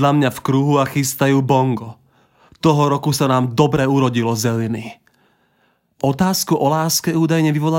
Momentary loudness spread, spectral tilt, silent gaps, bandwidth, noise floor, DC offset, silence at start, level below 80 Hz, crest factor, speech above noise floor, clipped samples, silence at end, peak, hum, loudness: 7 LU; -5.5 dB/octave; none; 16.5 kHz; -62 dBFS; under 0.1%; 0 s; -52 dBFS; 16 dB; 46 dB; under 0.1%; 0 s; -2 dBFS; none; -17 LUFS